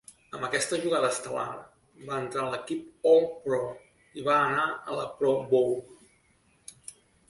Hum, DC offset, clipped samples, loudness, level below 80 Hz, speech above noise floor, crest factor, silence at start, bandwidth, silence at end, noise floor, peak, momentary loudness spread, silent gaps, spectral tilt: none; under 0.1%; under 0.1%; -28 LUFS; -68 dBFS; 38 dB; 18 dB; 0.35 s; 11.5 kHz; 0.4 s; -66 dBFS; -10 dBFS; 22 LU; none; -4 dB/octave